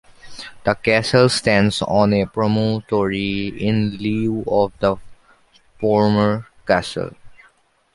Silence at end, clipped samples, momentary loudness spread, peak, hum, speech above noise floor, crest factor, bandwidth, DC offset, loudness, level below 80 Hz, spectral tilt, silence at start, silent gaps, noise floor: 0.6 s; under 0.1%; 11 LU; -2 dBFS; none; 39 dB; 18 dB; 11.5 kHz; under 0.1%; -19 LUFS; -46 dBFS; -6 dB/octave; 0.25 s; none; -56 dBFS